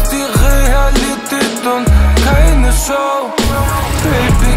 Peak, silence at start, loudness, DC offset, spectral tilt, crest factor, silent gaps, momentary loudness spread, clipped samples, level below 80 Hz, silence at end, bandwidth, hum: 0 dBFS; 0 s; -13 LUFS; under 0.1%; -5 dB/octave; 10 dB; none; 5 LU; under 0.1%; -12 dBFS; 0 s; 16.5 kHz; none